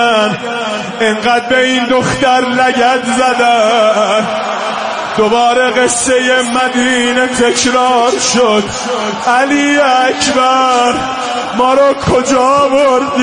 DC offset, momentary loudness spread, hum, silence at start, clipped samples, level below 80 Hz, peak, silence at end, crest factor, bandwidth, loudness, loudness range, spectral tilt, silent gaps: under 0.1%; 7 LU; none; 0 s; under 0.1%; -44 dBFS; 0 dBFS; 0 s; 10 dB; 10.5 kHz; -11 LUFS; 1 LU; -3 dB/octave; none